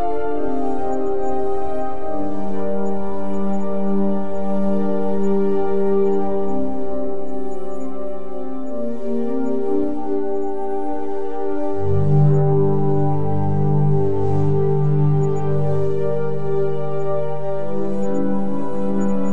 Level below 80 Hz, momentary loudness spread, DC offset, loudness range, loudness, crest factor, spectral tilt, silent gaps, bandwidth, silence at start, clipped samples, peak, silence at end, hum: -46 dBFS; 9 LU; 20%; 6 LU; -22 LUFS; 14 dB; -10 dB/octave; none; 7.4 kHz; 0 s; under 0.1%; -4 dBFS; 0 s; none